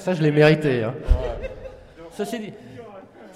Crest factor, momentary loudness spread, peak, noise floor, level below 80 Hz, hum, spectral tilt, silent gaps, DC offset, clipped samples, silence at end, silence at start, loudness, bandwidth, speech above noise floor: 18 dB; 25 LU; -4 dBFS; -43 dBFS; -30 dBFS; none; -7 dB/octave; none; under 0.1%; under 0.1%; 0 s; 0 s; -21 LUFS; 13.5 kHz; 23 dB